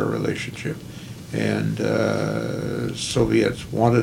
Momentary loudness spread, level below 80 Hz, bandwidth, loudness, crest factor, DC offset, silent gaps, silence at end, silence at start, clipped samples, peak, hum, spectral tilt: 11 LU; -46 dBFS; 16.5 kHz; -23 LUFS; 20 dB; under 0.1%; none; 0 s; 0 s; under 0.1%; -4 dBFS; none; -6 dB/octave